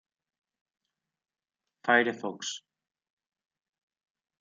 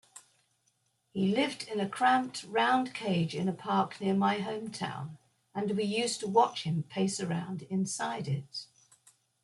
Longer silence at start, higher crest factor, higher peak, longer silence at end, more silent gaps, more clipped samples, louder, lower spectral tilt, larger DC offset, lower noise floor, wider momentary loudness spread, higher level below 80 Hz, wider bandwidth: first, 1.85 s vs 0.15 s; first, 28 dB vs 20 dB; about the same, -8 dBFS vs -10 dBFS; first, 1.85 s vs 0.8 s; neither; neither; first, -28 LUFS vs -31 LUFS; second, -3 dB/octave vs -5 dB/octave; neither; first, -89 dBFS vs -75 dBFS; first, 13 LU vs 10 LU; second, -88 dBFS vs -74 dBFS; second, 9 kHz vs 12 kHz